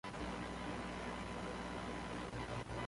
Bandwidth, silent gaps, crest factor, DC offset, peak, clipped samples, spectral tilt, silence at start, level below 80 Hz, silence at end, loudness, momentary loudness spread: 11.5 kHz; none; 12 dB; under 0.1%; -32 dBFS; under 0.1%; -5 dB/octave; 0.05 s; -56 dBFS; 0 s; -45 LUFS; 0 LU